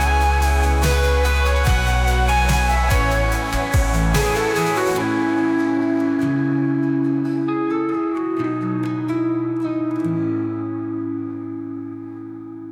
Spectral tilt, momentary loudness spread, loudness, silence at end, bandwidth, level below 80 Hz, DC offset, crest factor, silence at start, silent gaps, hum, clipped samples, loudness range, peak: -5.5 dB/octave; 10 LU; -20 LUFS; 0 s; 18.5 kHz; -24 dBFS; under 0.1%; 12 dB; 0 s; none; none; under 0.1%; 6 LU; -6 dBFS